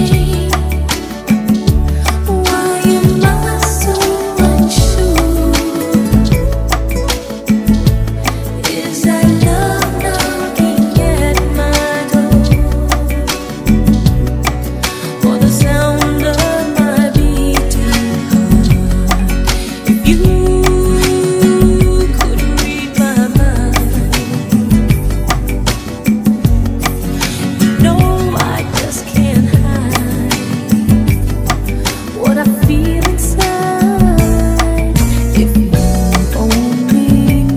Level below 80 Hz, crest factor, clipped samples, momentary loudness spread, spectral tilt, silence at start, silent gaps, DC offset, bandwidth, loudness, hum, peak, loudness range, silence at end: -16 dBFS; 12 dB; 0.5%; 6 LU; -5.5 dB/octave; 0 s; none; under 0.1%; 18 kHz; -12 LUFS; none; 0 dBFS; 2 LU; 0 s